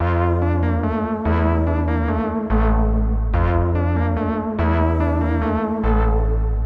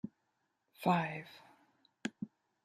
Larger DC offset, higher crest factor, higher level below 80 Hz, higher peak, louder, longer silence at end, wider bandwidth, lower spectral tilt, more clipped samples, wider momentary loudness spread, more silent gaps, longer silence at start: neither; second, 12 dB vs 24 dB; first, -22 dBFS vs -80 dBFS; first, -6 dBFS vs -16 dBFS; first, -20 LUFS vs -37 LUFS; second, 0 s vs 0.4 s; second, 4.2 kHz vs 15 kHz; first, -10.5 dB/octave vs -6.5 dB/octave; neither; second, 3 LU vs 20 LU; neither; about the same, 0 s vs 0.05 s